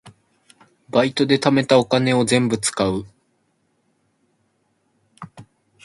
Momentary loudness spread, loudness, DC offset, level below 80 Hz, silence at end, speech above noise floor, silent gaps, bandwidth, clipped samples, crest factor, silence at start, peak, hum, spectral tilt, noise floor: 25 LU; -18 LUFS; under 0.1%; -56 dBFS; 0.45 s; 49 dB; none; 11.5 kHz; under 0.1%; 22 dB; 0.05 s; 0 dBFS; none; -4.5 dB/octave; -67 dBFS